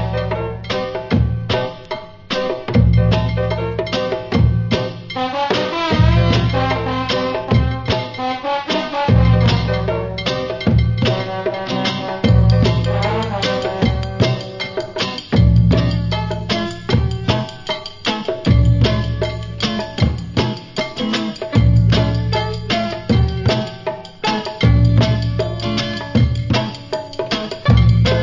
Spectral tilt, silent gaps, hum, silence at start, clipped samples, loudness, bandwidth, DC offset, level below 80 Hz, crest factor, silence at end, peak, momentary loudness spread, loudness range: -7 dB/octave; none; none; 0 s; under 0.1%; -18 LUFS; 7.6 kHz; under 0.1%; -26 dBFS; 16 dB; 0 s; 0 dBFS; 9 LU; 1 LU